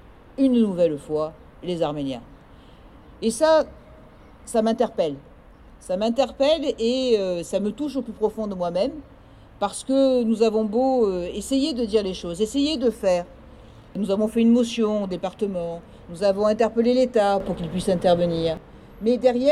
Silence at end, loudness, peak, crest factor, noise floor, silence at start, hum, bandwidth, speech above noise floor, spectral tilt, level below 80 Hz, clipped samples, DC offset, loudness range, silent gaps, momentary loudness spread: 0 s; -23 LUFS; -6 dBFS; 18 dB; -47 dBFS; 0.4 s; none; 13 kHz; 26 dB; -5.5 dB/octave; -48 dBFS; under 0.1%; under 0.1%; 3 LU; none; 11 LU